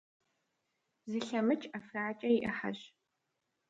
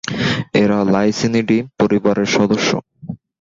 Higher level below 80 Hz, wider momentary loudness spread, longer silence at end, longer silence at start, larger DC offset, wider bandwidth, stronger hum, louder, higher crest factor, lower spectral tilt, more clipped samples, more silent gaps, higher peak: second, -74 dBFS vs -48 dBFS; about the same, 10 LU vs 9 LU; first, 0.8 s vs 0.25 s; first, 1.05 s vs 0.05 s; neither; about the same, 8 kHz vs 7.8 kHz; neither; second, -35 LUFS vs -16 LUFS; about the same, 18 dB vs 14 dB; about the same, -5.5 dB/octave vs -5.5 dB/octave; neither; neither; second, -18 dBFS vs -2 dBFS